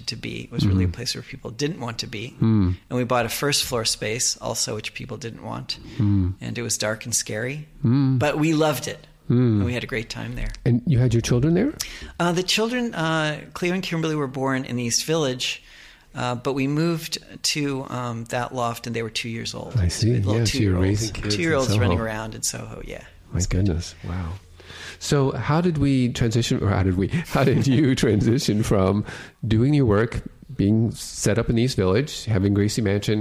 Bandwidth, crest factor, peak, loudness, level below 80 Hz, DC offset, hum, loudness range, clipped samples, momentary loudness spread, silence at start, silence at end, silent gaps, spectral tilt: 16 kHz; 18 dB; -6 dBFS; -23 LUFS; -42 dBFS; under 0.1%; none; 5 LU; under 0.1%; 11 LU; 0 s; 0 s; none; -5 dB/octave